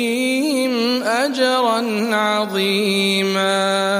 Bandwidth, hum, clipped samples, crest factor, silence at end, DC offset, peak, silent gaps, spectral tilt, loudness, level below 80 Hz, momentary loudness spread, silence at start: 15.5 kHz; none; under 0.1%; 14 dB; 0 s; under 0.1%; -4 dBFS; none; -3.5 dB/octave; -17 LUFS; -74 dBFS; 2 LU; 0 s